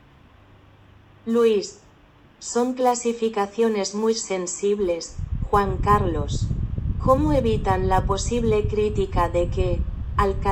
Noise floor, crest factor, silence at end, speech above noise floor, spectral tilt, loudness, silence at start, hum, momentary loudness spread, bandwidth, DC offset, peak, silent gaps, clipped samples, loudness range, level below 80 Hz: -52 dBFS; 18 dB; 0 s; 31 dB; -5.5 dB/octave; -23 LUFS; 1.25 s; none; 7 LU; 16 kHz; under 0.1%; -4 dBFS; none; under 0.1%; 2 LU; -32 dBFS